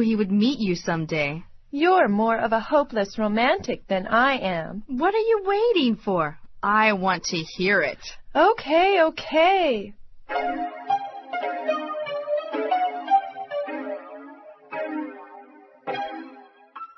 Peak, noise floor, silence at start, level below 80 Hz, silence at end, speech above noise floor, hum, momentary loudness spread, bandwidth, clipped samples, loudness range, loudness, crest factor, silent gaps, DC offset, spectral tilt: -6 dBFS; -48 dBFS; 0 s; -52 dBFS; 0.1 s; 26 dB; none; 14 LU; 6.2 kHz; under 0.1%; 7 LU; -23 LUFS; 18 dB; none; under 0.1%; -5.5 dB/octave